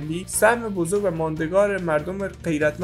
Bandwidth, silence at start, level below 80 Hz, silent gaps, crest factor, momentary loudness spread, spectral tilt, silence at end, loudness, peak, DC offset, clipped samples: 16 kHz; 0 s; -46 dBFS; none; 18 dB; 7 LU; -5 dB/octave; 0 s; -22 LUFS; -4 dBFS; under 0.1%; under 0.1%